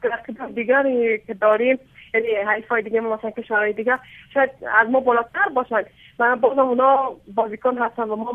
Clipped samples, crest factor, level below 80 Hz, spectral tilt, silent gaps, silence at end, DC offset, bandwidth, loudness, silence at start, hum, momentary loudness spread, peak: under 0.1%; 20 dB; -62 dBFS; -7 dB/octave; none; 0 s; under 0.1%; 3.8 kHz; -20 LUFS; 0 s; none; 9 LU; -2 dBFS